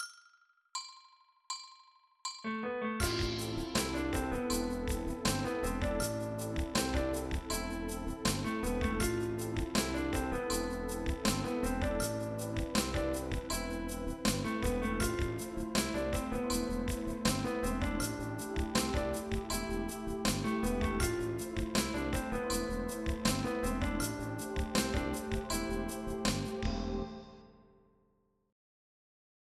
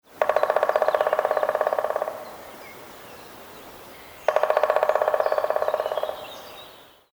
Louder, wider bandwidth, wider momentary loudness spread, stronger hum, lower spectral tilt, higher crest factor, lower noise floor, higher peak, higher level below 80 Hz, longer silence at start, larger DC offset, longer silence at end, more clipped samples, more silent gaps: second, -35 LUFS vs -24 LUFS; second, 15 kHz vs over 20 kHz; second, 6 LU vs 20 LU; neither; first, -4.5 dB/octave vs -3 dB/octave; about the same, 20 dB vs 24 dB; first, -74 dBFS vs -48 dBFS; second, -16 dBFS vs -2 dBFS; first, -44 dBFS vs -66 dBFS; second, 0 s vs 0.15 s; neither; first, 1.95 s vs 0.3 s; neither; neither